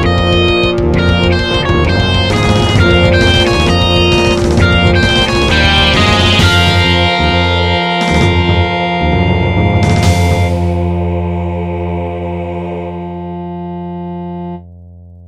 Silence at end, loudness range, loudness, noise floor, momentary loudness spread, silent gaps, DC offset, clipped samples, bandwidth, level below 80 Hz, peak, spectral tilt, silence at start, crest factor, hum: 0 s; 10 LU; -11 LUFS; -34 dBFS; 14 LU; none; 1%; under 0.1%; 12.5 kHz; -22 dBFS; 0 dBFS; -5.5 dB/octave; 0 s; 12 dB; none